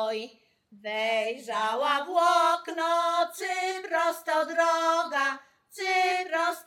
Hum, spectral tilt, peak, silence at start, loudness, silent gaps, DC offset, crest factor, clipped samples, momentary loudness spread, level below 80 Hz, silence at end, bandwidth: none; -1 dB/octave; -12 dBFS; 0 s; -27 LUFS; none; under 0.1%; 16 dB; under 0.1%; 9 LU; -90 dBFS; 0.05 s; 17.5 kHz